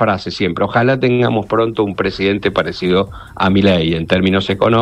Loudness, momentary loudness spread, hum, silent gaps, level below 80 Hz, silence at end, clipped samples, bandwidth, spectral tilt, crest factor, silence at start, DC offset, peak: -15 LUFS; 5 LU; none; none; -40 dBFS; 0 s; under 0.1%; 9.6 kHz; -7 dB/octave; 14 dB; 0 s; under 0.1%; 0 dBFS